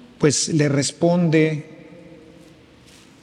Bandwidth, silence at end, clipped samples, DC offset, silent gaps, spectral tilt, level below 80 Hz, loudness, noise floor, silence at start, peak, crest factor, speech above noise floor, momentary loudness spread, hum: 11 kHz; 1.45 s; under 0.1%; under 0.1%; none; -5 dB/octave; -60 dBFS; -19 LUFS; -48 dBFS; 0.2 s; -4 dBFS; 18 dB; 30 dB; 9 LU; none